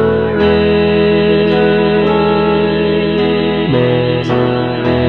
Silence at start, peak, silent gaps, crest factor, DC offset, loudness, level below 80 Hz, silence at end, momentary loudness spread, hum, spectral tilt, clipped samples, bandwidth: 0 s; 0 dBFS; none; 12 dB; 1%; -12 LUFS; -34 dBFS; 0 s; 3 LU; none; -8.5 dB/octave; under 0.1%; 6 kHz